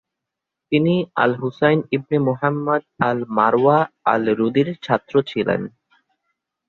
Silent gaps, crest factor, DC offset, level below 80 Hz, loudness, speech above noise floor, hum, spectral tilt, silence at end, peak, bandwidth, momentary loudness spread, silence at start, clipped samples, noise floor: none; 18 dB; under 0.1%; -60 dBFS; -19 LUFS; 64 dB; none; -8.5 dB/octave; 1 s; -2 dBFS; 6.8 kHz; 6 LU; 0.7 s; under 0.1%; -83 dBFS